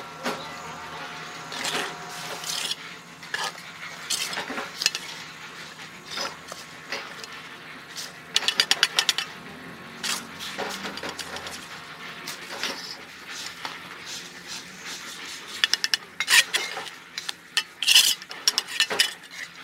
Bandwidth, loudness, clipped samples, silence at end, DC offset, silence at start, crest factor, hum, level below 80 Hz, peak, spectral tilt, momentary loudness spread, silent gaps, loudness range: 16 kHz; -26 LUFS; under 0.1%; 0 s; under 0.1%; 0 s; 28 dB; none; -70 dBFS; -2 dBFS; 0.5 dB/octave; 18 LU; none; 13 LU